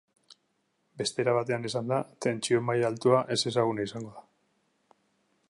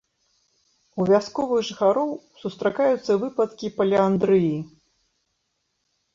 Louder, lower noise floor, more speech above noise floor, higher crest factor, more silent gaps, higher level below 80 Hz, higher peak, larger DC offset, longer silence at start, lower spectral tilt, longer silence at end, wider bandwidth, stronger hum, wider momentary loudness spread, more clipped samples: second, -28 LUFS vs -22 LUFS; about the same, -75 dBFS vs -75 dBFS; second, 47 dB vs 53 dB; about the same, 20 dB vs 18 dB; neither; second, -72 dBFS vs -62 dBFS; second, -10 dBFS vs -6 dBFS; neither; about the same, 0.95 s vs 0.95 s; second, -5 dB/octave vs -7 dB/octave; second, 1.3 s vs 1.45 s; first, 11.5 kHz vs 7.6 kHz; neither; second, 9 LU vs 12 LU; neither